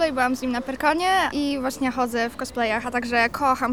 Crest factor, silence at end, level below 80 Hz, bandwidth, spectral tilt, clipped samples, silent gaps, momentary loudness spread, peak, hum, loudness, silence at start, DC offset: 16 dB; 0 s; -48 dBFS; 17.5 kHz; -3.5 dB/octave; under 0.1%; none; 6 LU; -6 dBFS; none; -23 LUFS; 0 s; 0.3%